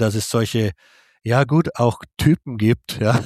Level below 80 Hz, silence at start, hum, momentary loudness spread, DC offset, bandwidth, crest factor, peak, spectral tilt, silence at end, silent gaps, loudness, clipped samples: -44 dBFS; 0 s; none; 5 LU; under 0.1%; 15 kHz; 18 dB; -2 dBFS; -6 dB/octave; 0 s; none; -20 LUFS; under 0.1%